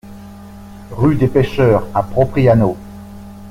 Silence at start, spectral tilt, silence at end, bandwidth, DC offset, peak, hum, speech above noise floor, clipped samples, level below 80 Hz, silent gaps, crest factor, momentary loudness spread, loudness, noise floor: 0.05 s; -9 dB/octave; 0 s; 15 kHz; under 0.1%; -2 dBFS; none; 21 dB; under 0.1%; -36 dBFS; none; 14 dB; 24 LU; -14 LUFS; -35 dBFS